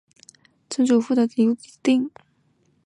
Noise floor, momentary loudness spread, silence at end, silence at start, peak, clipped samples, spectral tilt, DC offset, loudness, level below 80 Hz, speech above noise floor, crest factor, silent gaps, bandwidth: -64 dBFS; 9 LU; 0.8 s; 0.7 s; -8 dBFS; under 0.1%; -5 dB/octave; under 0.1%; -22 LUFS; -74 dBFS; 44 dB; 14 dB; none; 10.5 kHz